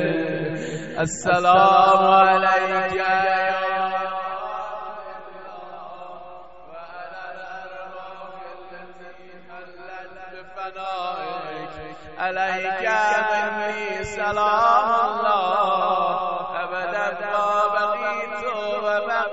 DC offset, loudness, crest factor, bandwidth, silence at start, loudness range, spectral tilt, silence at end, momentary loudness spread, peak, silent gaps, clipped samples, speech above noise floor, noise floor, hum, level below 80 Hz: 0.5%; -21 LUFS; 20 dB; 8.2 kHz; 0 s; 20 LU; -4 dB/octave; 0 s; 23 LU; -2 dBFS; none; under 0.1%; 26 dB; -44 dBFS; none; -56 dBFS